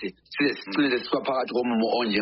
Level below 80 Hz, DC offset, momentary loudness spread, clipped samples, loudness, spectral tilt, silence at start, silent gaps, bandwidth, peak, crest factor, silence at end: -66 dBFS; under 0.1%; 2 LU; under 0.1%; -25 LUFS; -2.5 dB/octave; 0 s; none; 5.8 kHz; -10 dBFS; 14 dB; 0 s